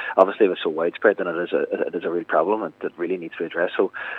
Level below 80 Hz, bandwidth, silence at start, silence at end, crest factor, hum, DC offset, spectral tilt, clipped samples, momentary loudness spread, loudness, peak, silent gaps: -78 dBFS; 4.8 kHz; 0 s; 0 s; 22 dB; none; under 0.1%; -7.5 dB/octave; under 0.1%; 9 LU; -23 LUFS; 0 dBFS; none